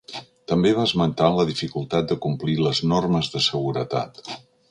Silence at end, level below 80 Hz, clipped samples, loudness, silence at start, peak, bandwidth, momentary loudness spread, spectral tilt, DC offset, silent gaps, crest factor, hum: 0.3 s; -52 dBFS; under 0.1%; -22 LUFS; 0.1 s; -2 dBFS; 10.5 kHz; 16 LU; -6 dB/octave; under 0.1%; none; 20 dB; none